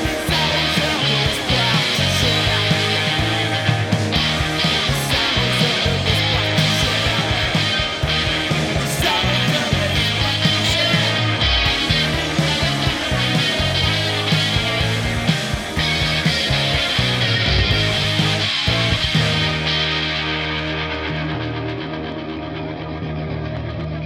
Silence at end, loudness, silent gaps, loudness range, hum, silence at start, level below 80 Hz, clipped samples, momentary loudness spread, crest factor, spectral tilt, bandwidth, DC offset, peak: 0 s; -18 LUFS; none; 3 LU; none; 0 s; -32 dBFS; under 0.1%; 8 LU; 16 dB; -4 dB/octave; 18.5 kHz; under 0.1%; -2 dBFS